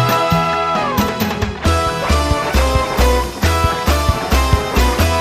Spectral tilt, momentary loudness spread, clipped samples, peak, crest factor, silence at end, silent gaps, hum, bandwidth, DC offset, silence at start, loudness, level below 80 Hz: -5 dB/octave; 2 LU; under 0.1%; 0 dBFS; 14 dB; 0 s; none; none; 16 kHz; under 0.1%; 0 s; -16 LUFS; -20 dBFS